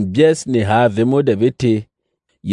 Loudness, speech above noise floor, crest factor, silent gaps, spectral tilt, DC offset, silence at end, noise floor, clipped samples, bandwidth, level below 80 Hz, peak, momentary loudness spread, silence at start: -15 LUFS; 55 dB; 14 dB; none; -6.5 dB/octave; under 0.1%; 0 s; -70 dBFS; under 0.1%; 11 kHz; -54 dBFS; -2 dBFS; 5 LU; 0 s